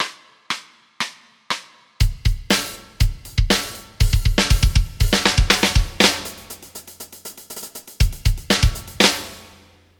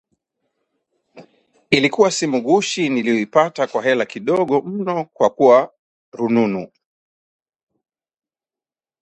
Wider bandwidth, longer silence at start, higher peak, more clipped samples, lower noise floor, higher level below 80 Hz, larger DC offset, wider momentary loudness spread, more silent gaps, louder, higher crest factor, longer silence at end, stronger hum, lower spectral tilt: first, 18 kHz vs 9.4 kHz; second, 0 s vs 1.15 s; about the same, 0 dBFS vs 0 dBFS; neither; second, -50 dBFS vs under -90 dBFS; first, -24 dBFS vs -64 dBFS; neither; first, 19 LU vs 9 LU; second, none vs 5.79-6.12 s; about the same, -20 LUFS vs -18 LUFS; about the same, 20 dB vs 20 dB; second, 0.55 s vs 2.35 s; neither; about the same, -3.5 dB/octave vs -4.5 dB/octave